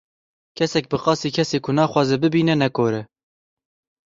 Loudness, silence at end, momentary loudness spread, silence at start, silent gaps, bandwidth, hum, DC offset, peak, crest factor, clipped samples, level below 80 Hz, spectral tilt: -20 LUFS; 1.1 s; 5 LU; 0.55 s; none; 7.8 kHz; none; under 0.1%; -2 dBFS; 18 dB; under 0.1%; -58 dBFS; -6 dB/octave